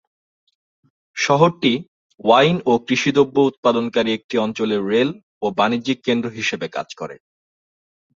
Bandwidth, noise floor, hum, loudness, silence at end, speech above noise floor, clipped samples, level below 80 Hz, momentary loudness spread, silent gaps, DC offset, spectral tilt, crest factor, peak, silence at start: 7.8 kHz; under -90 dBFS; none; -19 LUFS; 1.05 s; over 72 dB; under 0.1%; -62 dBFS; 11 LU; 1.88-2.10 s, 3.58-3.63 s, 4.24-4.29 s, 5.23-5.41 s; under 0.1%; -5 dB/octave; 18 dB; -2 dBFS; 1.15 s